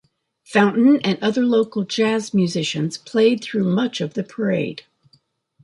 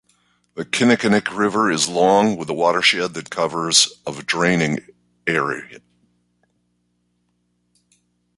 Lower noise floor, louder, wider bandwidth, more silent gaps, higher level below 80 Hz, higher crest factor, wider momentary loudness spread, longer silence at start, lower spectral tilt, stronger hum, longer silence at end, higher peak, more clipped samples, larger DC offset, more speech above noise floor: second, -61 dBFS vs -68 dBFS; about the same, -19 LUFS vs -18 LUFS; about the same, 11.5 kHz vs 11.5 kHz; neither; second, -66 dBFS vs -58 dBFS; about the same, 18 dB vs 20 dB; second, 9 LU vs 12 LU; about the same, 0.5 s vs 0.55 s; first, -5.5 dB/octave vs -3 dB/octave; second, none vs 60 Hz at -50 dBFS; second, 0.85 s vs 2.6 s; about the same, -2 dBFS vs 0 dBFS; neither; neither; second, 42 dB vs 49 dB